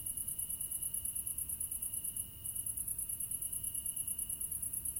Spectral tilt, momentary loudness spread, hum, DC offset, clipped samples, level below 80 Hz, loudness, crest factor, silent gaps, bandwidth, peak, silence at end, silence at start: -1 dB/octave; 1 LU; none; under 0.1%; under 0.1%; -60 dBFS; -37 LUFS; 16 dB; none; 17 kHz; -24 dBFS; 0 s; 0 s